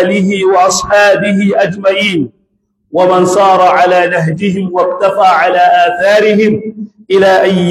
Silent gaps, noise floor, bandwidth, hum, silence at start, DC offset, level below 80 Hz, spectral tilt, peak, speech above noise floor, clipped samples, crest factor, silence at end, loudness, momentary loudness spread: none; -60 dBFS; 14 kHz; none; 0 s; under 0.1%; -48 dBFS; -5 dB/octave; 0 dBFS; 52 dB; under 0.1%; 10 dB; 0 s; -9 LUFS; 6 LU